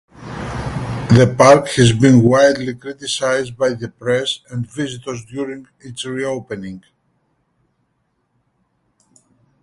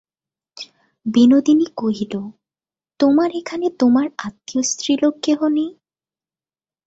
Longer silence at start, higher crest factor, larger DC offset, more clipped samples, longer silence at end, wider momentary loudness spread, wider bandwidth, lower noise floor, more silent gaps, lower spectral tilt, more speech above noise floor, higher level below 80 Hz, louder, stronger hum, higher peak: second, 0.2 s vs 0.6 s; about the same, 18 dB vs 16 dB; neither; neither; first, 2.85 s vs 1.15 s; about the same, 19 LU vs 17 LU; first, 11.5 kHz vs 8 kHz; second, -67 dBFS vs under -90 dBFS; neither; about the same, -5.5 dB/octave vs -4.5 dB/octave; second, 52 dB vs over 73 dB; first, -44 dBFS vs -62 dBFS; about the same, -16 LUFS vs -18 LUFS; neither; first, 0 dBFS vs -4 dBFS